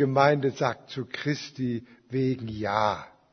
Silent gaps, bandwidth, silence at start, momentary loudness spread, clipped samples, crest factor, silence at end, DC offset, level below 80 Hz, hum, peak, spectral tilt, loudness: none; 6.6 kHz; 0 s; 13 LU; under 0.1%; 22 dB; 0.25 s; under 0.1%; -62 dBFS; none; -6 dBFS; -6.5 dB/octave; -28 LUFS